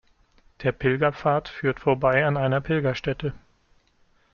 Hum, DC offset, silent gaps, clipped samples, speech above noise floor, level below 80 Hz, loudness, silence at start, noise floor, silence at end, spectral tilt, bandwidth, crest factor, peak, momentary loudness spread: none; under 0.1%; none; under 0.1%; 39 dB; -50 dBFS; -24 LUFS; 0.6 s; -62 dBFS; 0.95 s; -8 dB/octave; 6.8 kHz; 18 dB; -6 dBFS; 8 LU